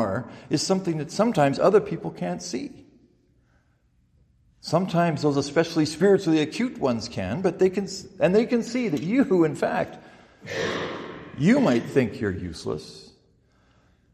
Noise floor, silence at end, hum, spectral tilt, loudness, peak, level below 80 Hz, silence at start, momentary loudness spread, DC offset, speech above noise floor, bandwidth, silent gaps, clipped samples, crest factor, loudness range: -64 dBFS; 1.1 s; none; -6 dB/octave; -24 LUFS; -6 dBFS; -60 dBFS; 0 s; 13 LU; under 0.1%; 41 dB; 14 kHz; none; under 0.1%; 20 dB; 5 LU